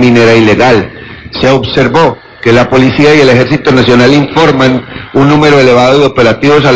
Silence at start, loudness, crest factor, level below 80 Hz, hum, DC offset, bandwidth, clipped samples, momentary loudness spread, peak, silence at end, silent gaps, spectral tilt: 0 s; -6 LUFS; 6 dB; -32 dBFS; none; 1%; 8 kHz; 8%; 7 LU; 0 dBFS; 0 s; none; -6 dB/octave